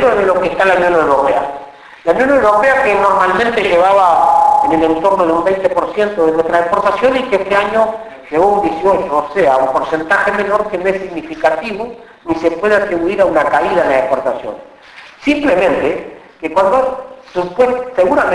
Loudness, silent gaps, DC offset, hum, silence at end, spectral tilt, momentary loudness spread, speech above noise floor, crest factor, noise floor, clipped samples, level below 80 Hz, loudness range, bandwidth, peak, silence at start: -13 LUFS; none; under 0.1%; none; 0 s; -5.5 dB/octave; 11 LU; 25 dB; 12 dB; -37 dBFS; under 0.1%; -44 dBFS; 5 LU; 11 kHz; 0 dBFS; 0 s